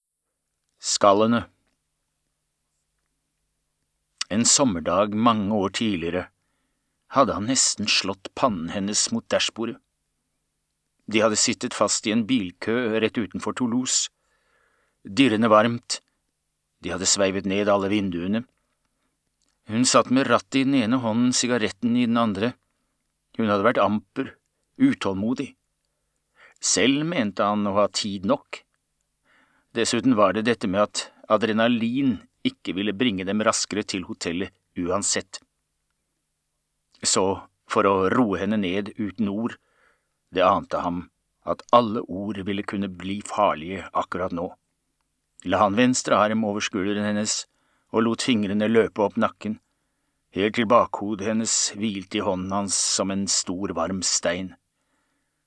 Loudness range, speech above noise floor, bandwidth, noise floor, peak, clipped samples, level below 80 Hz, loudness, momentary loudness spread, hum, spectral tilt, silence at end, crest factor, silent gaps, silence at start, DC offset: 3 LU; 56 dB; 9.8 kHz; -79 dBFS; -2 dBFS; under 0.1%; -62 dBFS; -23 LUFS; 12 LU; none; -3.5 dB/octave; 0.95 s; 22 dB; none; 0.85 s; under 0.1%